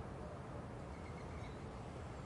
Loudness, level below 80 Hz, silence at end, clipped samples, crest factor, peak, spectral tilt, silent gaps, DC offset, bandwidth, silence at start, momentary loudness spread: -50 LUFS; -58 dBFS; 0 s; under 0.1%; 12 dB; -38 dBFS; -7 dB/octave; none; under 0.1%; 11.5 kHz; 0 s; 1 LU